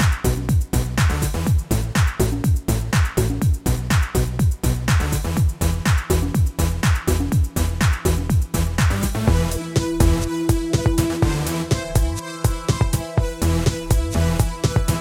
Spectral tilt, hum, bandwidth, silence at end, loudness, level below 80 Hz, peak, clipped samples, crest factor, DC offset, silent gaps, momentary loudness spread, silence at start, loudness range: -5.5 dB/octave; none; 17 kHz; 0 s; -21 LUFS; -24 dBFS; -4 dBFS; under 0.1%; 16 dB; under 0.1%; none; 3 LU; 0 s; 1 LU